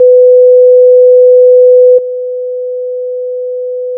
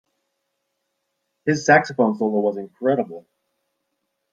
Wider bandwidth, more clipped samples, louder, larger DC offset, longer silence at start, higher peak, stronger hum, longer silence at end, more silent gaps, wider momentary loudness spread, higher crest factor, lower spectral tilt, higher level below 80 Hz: second, 0.6 kHz vs 7.8 kHz; neither; first, -4 LUFS vs -20 LUFS; neither; second, 0 s vs 1.45 s; about the same, 0 dBFS vs -2 dBFS; first, 50 Hz at -85 dBFS vs none; second, 0 s vs 1.15 s; neither; first, 13 LU vs 10 LU; second, 6 dB vs 22 dB; first, -11 dB/octave vs -5.5 dB/octave; second, -74 dBFS vs -68 dBFS